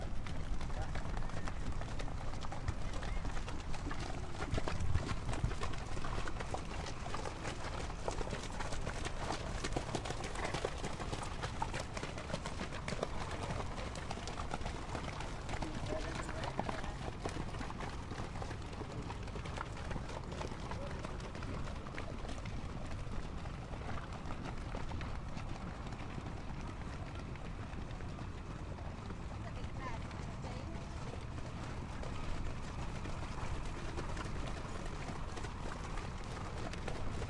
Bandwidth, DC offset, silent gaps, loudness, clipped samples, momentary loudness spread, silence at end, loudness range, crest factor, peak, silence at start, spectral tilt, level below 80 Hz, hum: 11.5 kHz; under 0.1%; none; -43 LUFS; under 0.1%; 5 LU; 0 s; 4 LU; 20 dB; -18 dBFS; 0 s; -5 dB/octave; -44 dBFS; none